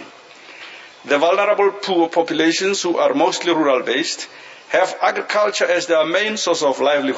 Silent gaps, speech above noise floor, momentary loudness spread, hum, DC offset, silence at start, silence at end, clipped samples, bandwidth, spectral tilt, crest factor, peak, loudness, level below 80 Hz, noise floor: none; 24 dB; 14 LU; none; under 0.1%; 0 s; 0 s; under 0.1%; 8 kHz; -2.5 dB/octave; 16 dB; -2 dBFS; -17 LUFS; -76 dBFS; -41 dBFS